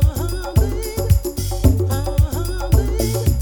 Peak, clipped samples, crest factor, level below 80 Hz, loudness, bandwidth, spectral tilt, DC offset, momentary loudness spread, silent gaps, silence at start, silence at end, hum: -2 dBFS; under 0.1%; 16 dB; -22 dBFS; -19 LUFS; over 20 kHz; -6.5 dB/octave; under 0.1%; 6 LU; none; 0 s; 0 s; none